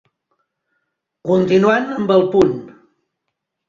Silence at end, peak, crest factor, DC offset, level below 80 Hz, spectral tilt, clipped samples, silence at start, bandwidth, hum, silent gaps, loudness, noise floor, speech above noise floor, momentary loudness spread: 1 s; -2 dBFS; 16 dB; under 0.1%; -54 dBFS; -7 dB/octave; under 0.1%; 1.25 s; 7.4 kHz; none; none; -15 LUFS; -77 dBFS; 63 dB; 10 LU